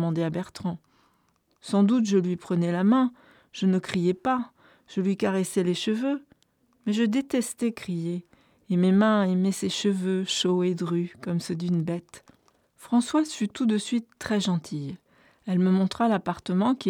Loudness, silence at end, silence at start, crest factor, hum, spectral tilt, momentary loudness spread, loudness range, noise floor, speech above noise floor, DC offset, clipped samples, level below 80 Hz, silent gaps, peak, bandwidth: -26 LUFS; 0 s; 0 s; 16 dB; none; -6 dB/octave; 12 LU; 3 LU; -68 dBFS; 44 dB; under 0.1%; under 0.1%; -66 dBFS; none; -10 dBFS; 13.5 kHz